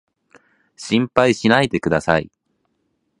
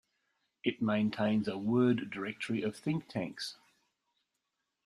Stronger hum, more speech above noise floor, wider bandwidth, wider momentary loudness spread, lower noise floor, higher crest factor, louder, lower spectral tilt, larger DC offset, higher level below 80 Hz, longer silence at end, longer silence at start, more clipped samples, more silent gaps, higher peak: neither; about the same, 52 dB vs 52 dB; about the same, 11 kHz vs 12 kHz; about the same, 10 LU vs 10 LU; second, -69 dBFS vs -85 dBFS; about the same, 20 dB vs 20 dB; first, -17 LUFS vs -34 LUFS; about the same, -5.5 dB/octave vs -6.5 dB/octave; neither; first, -48 dBFS vs -72 dBFS; second, 0.95 s vs 1.3 s; first, 0.8 s vs 0.65 s; neither; neither; first, 0 dBFS vs -16 dBFS